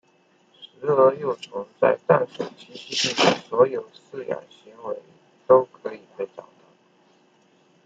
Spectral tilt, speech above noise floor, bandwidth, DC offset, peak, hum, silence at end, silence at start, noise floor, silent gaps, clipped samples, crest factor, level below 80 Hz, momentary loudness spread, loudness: -4 dB/octave; 38 dB; 8.8 kHz; under 0.1%; -2 dBFS; none; 1.45 s; 0.6 s; -61 dBFS; none; under 0.1%; 22 dB; -72 dBFS; 18 LU; -22 LUFS